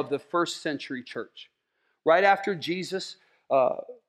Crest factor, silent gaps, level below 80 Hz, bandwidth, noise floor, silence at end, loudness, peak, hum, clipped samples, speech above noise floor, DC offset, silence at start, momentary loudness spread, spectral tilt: 20 dB; none; -84 dBFS; 13 kHz; -75 dBFS; 0.15 s; -26 LUFS; -6 dBFS; none; under 0.1%; 48 dB; under 0.1%; 0 s; 17 LU; -4.5 dB/octave